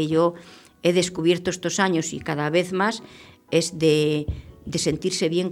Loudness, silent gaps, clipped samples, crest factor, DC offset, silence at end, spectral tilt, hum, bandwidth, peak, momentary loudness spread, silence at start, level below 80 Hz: -23 LUFS; none; under 0.1%; 18 dB; under 0.1%; 0 s; -4.5 dB/octave; none; 15.5 kHz; -6 dBFS; 8 LU; 0 s; -46 dBFS